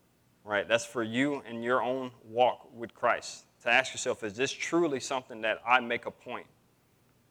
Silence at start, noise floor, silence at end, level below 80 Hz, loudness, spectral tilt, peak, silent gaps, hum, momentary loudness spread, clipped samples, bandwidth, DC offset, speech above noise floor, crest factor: 0.45 s; -67 dBFS; 0.9 s; -78 dBFS; -30 LUFS; -3.5 dB/octave; -8 dBFS; none; none; 14 LU; under 0.1%; 17.5 kHz; under 0.1%; 36 dB; 24 dB